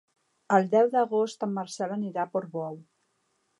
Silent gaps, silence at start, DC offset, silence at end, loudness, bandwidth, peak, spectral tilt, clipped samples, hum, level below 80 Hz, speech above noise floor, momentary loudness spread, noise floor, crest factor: none; 0.5 s; under 0.1%; 0.8 s; -27 LUFS; 11.5 kHz; -8 dBFS; -6 dB/octave; under 0.1%; none; -84 dBFS; 47 dB; 13 LU; -74 dBFS; 20 dB